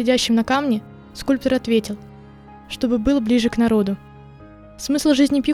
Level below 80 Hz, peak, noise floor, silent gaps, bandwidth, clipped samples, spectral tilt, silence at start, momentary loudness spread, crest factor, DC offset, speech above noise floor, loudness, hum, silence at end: -44 dBFS; -4 dBFS; -42 dBFS; none; 15 kHz; under 0.1%; -4.5 dB/octave; 0 s; 15 LU; 16 dB; under 0.1%; 24 dB; -19 LUFS; none; 0 s